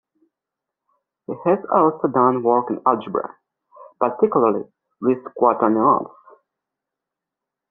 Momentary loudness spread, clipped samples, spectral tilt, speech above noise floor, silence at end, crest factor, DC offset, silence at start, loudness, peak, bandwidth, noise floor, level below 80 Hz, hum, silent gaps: 11 LU; under 0.1%; -8 dB/octave; 66 dB; 1.65 s; 20 dB; under 0.1%; 1.3 s; -19 LUFS; -2 dBFS; 3.7 kHz; -85 dBFS; -66 dBFS; none; none